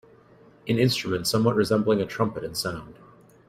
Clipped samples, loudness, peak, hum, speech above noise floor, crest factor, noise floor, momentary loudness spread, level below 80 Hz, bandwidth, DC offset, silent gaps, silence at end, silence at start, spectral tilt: under 0.1%; -24 LUFS; -8 dBFS; none; 30 dB; 18 dB; -54 dBFS; 9 LU; -58 dBFS; 16 kHz; under 0.1%; none; 0.55 s; 0.65 s; -5.5 dB/octave